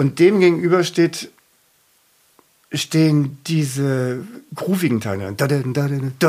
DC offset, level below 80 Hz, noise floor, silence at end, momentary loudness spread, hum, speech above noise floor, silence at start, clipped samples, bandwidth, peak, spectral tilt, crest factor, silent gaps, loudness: under 0.1%; -66 dBFS; -59 dBFS; 0 s; 14 LU; none; 41 dB; 0 s; under 0.1%; 15.5 kHz; -2 dBFS; -6 dB/octave; 16 dB; none; -19 LUFS